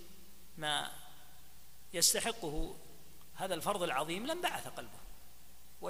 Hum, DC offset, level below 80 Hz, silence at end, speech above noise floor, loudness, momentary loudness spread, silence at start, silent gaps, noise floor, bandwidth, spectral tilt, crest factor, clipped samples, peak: none; 0.4%; -52 dBFS; 0 s; 23 dB; -35 LUFS; 27 LU; 0 s; none; -60 dBFS; 15.5 kHz; -1.5 dB/octave; 24 dB; under 0.1%; -14 dBFS